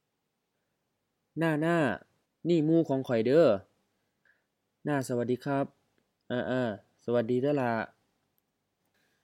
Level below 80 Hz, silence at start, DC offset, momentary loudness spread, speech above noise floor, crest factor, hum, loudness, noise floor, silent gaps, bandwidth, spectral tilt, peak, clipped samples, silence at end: -76 dBFS; 1.35 s; under 0.1%; 13 LU; 54 dB; 18 dB; none; -29 LUFS; -82 dBFS; none; 15 kHz; -7.5 dB/octave; -12 dBFS; under 0.1%; 1.35 s